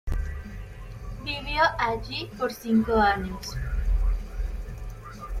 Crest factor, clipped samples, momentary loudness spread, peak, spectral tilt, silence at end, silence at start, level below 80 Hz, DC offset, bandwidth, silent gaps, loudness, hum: 16 dB; under 0.1%; 18 LU; -10 dBFS; -5.5 dB/octave; 0 s; 0.05 s; -32 dBFS; under 0.1%; 14.5 kHz; none; -27 LUFS; none